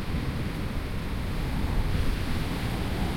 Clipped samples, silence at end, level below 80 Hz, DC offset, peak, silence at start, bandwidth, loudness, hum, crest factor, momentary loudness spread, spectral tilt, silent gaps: under 0.1%; 0 s; -32 dBFS; under 0.1%; -14 dBFS; 0 s; 16.5 kHz; -31 LUFS; none; 14 dB; 4 LU; -6 dB/octave; none